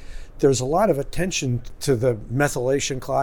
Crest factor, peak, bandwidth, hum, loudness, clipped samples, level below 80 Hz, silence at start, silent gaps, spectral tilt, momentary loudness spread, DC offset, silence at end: 16 dB; -6 dBFS; 19 kHz; none; -22 LUFS; under 0.1%; -38 dBFS; 0 s; none; -5 dB/octave; 5 LU; under 0.1%; 0 s